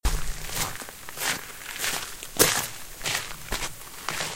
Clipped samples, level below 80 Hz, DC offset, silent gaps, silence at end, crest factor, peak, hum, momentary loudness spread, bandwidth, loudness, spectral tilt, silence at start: under 0.1%; -36 dBFS; 0.3%; none; 0 s; 30 dB; 0 dBFS; none; 14 LU; 16.5 kHz; -28 LUFS; -1.5 dB/octave; 0 s